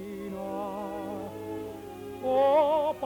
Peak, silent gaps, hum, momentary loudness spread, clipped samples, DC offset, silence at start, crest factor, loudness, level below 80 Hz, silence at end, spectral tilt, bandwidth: -14 dBFS; none; none; 16 LU; under 0.1%; under 0.1%; 0 s; 14 dB; -29 LUFS; -62 dBFS; 0 s; -6.5 dB/octave; 19 kHz